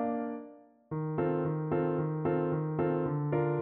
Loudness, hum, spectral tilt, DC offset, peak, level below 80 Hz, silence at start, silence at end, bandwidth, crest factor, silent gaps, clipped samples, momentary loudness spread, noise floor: -32 LUFS; none; -10 dB/octave; under 0.1%; -18 dBFS; -64 dBFS; 0 s; 0 s; 3.7 kHz; 12 dB; none; under 0.1%; 9 LU; -53 dBFS